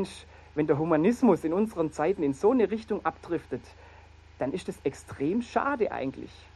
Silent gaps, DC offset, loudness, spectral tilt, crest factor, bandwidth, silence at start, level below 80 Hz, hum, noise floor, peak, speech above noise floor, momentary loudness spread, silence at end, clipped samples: none; under 0.1%; -28 LUFS; -7 dB/octave; 18 dB; 12.5 kHz; 0 s; -56 dBFS; none; -52 dBFS; -10 dBFS; 24 dB; 12 LU; 0.25 s; under 0.1%